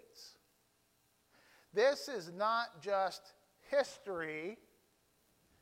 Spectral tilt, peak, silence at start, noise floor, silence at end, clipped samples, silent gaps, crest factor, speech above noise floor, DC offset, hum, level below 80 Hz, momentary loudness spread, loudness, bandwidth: -3 dB/octave; -20 dBFS; 0.15 s; -75 dBFS; 1.05 s; under 0.1%; none; 18 dB; 39 dB; under 0.1%; none; -82 dBFS; 22 LU; -37 LUFS; 16 kHz